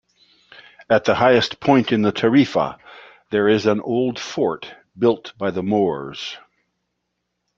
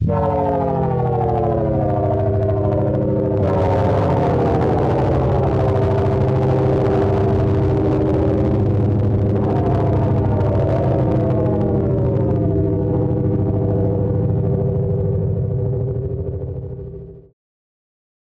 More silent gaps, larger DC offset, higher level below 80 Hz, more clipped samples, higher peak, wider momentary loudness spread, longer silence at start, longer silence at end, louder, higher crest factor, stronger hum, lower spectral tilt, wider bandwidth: neither; neither; second, -58 dBFS vs -32 dBFS; neither; first, -2 dBFS vs -6 dBFS; first, 14 LU vs 4 LU; first, 0.8 s vs 0 s; about the same, 1.2 s vs 1.1 s; about the same, -19 LUFS vs -18 LUFS; first, 18 dB vs 10 dB; first, 60 Hz at -55 dBFS vs none; second, -6 dB/octave vs -10.5 dB/octave; first, 7.4 kHz vs 5.8 kHz